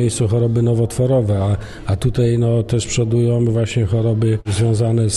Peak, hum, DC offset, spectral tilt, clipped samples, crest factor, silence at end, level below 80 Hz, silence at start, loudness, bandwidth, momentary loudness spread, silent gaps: -4 dBFS; none; under 0.1%; -6.5 dB/octave; under 0.1%; 12 dB; 0 s; -38 dBFS; 0 s; -17 LUFS; 12 kHz; 3 LU; none